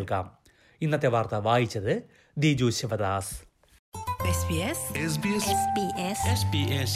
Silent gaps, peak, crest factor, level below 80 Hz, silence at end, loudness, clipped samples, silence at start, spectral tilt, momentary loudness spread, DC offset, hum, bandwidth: 3.79-3.92 s; -10 dBFS; 18 dB; -52 dBFS; 0 s; -27 LUFS; under 0.1%; 0 s; -5 dB/octave; 10 LU; under 0.1%; none; 15.5 kHz